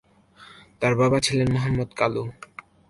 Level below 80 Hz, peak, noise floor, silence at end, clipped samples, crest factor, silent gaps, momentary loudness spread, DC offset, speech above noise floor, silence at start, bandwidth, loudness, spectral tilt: -48 dBFS; -6 dBFS; -51 dBFS; 0.6 s; under 0.1%; 18 dB; none; 17 LU; under 0.1%; 29 dB; 0.4 s; 11.5 kHz; -23 LUFS; -5.5 dB/octave